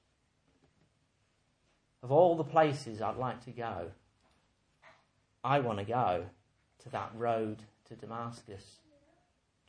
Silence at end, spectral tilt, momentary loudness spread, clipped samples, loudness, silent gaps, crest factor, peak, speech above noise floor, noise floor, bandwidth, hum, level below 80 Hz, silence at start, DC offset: 1.05 s; -7 dB/octave; 23 LU; under 0.1%; -33 LUFS; none; 22 dB; -12 dBFS; 42 dB; -75 dBFS; 10 kHz; none; -70 dBFS; 2.05 s; under 0.1%